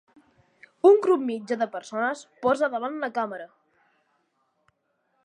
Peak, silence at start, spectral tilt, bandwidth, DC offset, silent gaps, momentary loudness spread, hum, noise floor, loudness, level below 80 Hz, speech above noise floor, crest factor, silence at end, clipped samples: -6 dBFS; 0.85 s; -5 dB/octave; 9.8 kHz; under 0.1%; none; 11 LU; none; -73 dBFS; -24 LUFS; -74 dBFS; 49 dB; 20 dB; 1.8 s; under 0.1%